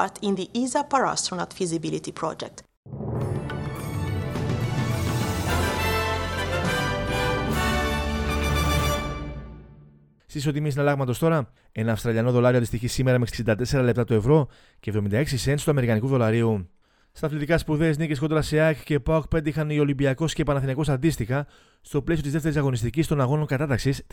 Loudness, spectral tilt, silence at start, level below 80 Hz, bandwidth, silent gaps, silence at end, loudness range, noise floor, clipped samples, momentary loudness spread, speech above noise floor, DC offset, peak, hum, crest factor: -24 LUFS; -6 dB/octave; 0 s; -38 dBFS; 18 kHz; 2.77-2.83 s; 0.1 s; 5 LU; -53 dBFS; under 0.1%; 9 LU; 30 dB; under 0.1%; -6 dBFS; none; 18 dB